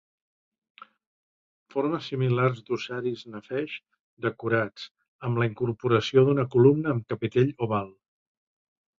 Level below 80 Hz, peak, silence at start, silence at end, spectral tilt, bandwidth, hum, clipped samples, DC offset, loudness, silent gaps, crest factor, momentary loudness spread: -64 dBFS; -6 dBFS; 1.75 s; 1.1 s; -8 dB/octave; 7.4 kHz; none; under 0.1%; under 0.1%; -26 LUFS; 4.00-4.17 s, 4.91-4.95 s, 5.08-5.19 s; 22 dB; 15 LU